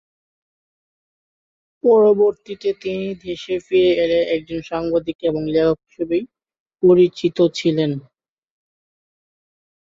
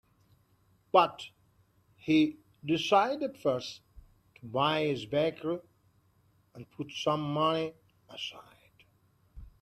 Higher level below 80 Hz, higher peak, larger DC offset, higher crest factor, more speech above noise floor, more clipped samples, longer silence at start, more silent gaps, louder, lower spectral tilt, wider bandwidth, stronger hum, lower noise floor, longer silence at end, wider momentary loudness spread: first, -54 dBFS vs -64 dBFS; first, -4 dBFS vs -8 dBFS; neither; second, 16 dB vs 24 dB; first, over 72 dB vs 38 dB; neither; first, 1.85 s vs 0.95 s; first, 5.15-5.19 s, 6.60-6.66 s vs none; first, -18 LUFS vs -30 LUFS; first, -7 dB/octave vs -5.5 dB/octave; second, 7.6 kHz vs 13 kHz; neither; first, under -90 dBFS vs -68 dBFS; first, 1.9 s vs 0.15 s; second, 12 LU vs 20 LU